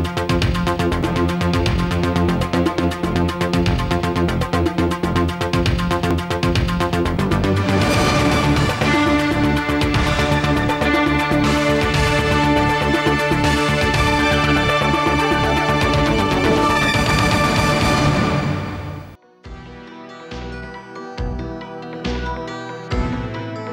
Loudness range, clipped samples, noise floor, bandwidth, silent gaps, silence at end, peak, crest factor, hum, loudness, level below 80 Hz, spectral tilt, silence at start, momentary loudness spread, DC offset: 11 LU; under 0.1%; -39 dBFS; 16.5 kHz; none; 0 s; -6 dBFS; 12 dB; none; -18 LUFS; -30 dBFS; -5.5 dB/octave; 0 s; 13 LU; under 0.1%